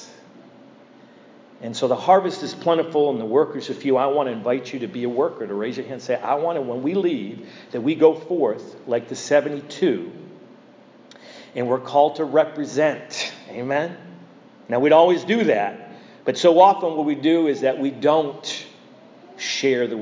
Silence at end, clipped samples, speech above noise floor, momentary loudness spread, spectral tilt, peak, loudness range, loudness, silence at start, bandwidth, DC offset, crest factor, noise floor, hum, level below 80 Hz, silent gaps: 0 s; under 0.1%; 28 dB; 13 LU; -5 dB/octave; -2 dBFS; 6 LU; -21 LUFS; 0 s; 7.6 kHz; under 0.1%; 20 dB; -48 dBFS; none; -78 dBFS; none